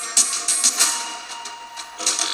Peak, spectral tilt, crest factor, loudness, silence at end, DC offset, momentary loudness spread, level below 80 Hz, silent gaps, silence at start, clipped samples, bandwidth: 0 dBFS; 3.5 dB/octave; 22 dB; -18 LUFS; 0 s; under 0.1%; 17 LU; -70 dBFS; none; 0 s; under 0.1%; over 20 kHz